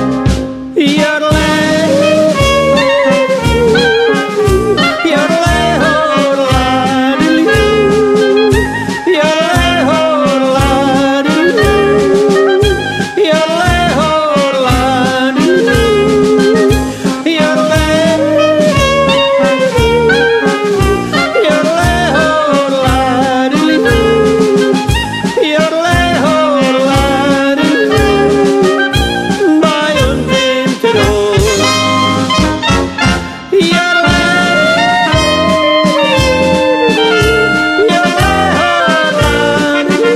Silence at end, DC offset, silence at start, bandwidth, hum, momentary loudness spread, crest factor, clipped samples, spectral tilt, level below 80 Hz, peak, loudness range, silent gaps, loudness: 0 s; under 0.1%; 0 s; 15 kHz; none; 3 LU; 10 dB; under 0.1%; -5 dB/octave; -24 dBFS; 0 dBFS; 1 LU; none; -10 LUFS